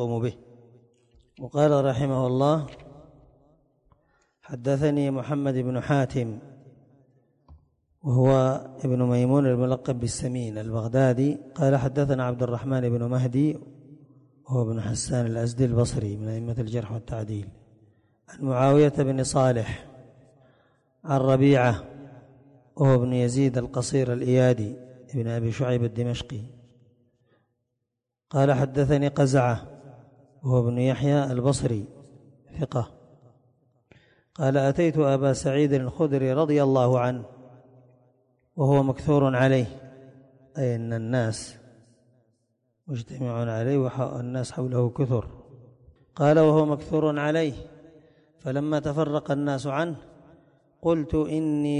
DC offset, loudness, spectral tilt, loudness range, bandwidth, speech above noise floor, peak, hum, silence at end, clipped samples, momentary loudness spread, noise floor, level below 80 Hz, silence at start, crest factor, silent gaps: under 0.1%; -25 LUFS; -7 dB/octave; 6 LU; 11 kHz; 60 dB; -8 dBFS; none; 0 s; under 0.1%; 14 LU; -83 dBFS; -52 dBFS; 0 s; 16 dB; none